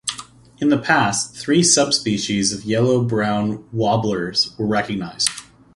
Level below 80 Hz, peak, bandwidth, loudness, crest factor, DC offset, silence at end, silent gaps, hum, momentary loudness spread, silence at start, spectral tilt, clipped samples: -52 dBFS; 0 dBFS; 11.5 kHz; -19 LUFS; 20 dB; under 0.1%; 0.35 s; none; none; 8 LU; 0.05 s; -3.5 dB/octave; under 0.1%